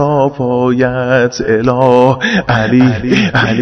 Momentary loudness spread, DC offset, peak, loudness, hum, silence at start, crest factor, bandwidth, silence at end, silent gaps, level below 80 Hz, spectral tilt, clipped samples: 4 LU; under 0.1%; 0 dBFS; -11 LUFS; none; 0 s; 10 dB; 6.4 kHz; 0 s; none; -38 dBFS; -6.5 dB/octave; 0.6%